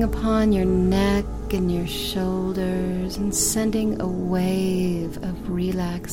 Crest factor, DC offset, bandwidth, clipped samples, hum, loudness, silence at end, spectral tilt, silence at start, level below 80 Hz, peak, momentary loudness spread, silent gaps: 14 dB; under 0.1%; 16.5 kHz; under 0.1%; none; -23 LUFS; 0 s; -5.5 dB/octave; 0 s; -34 dBFS; -8 dBFS; 7 LU; none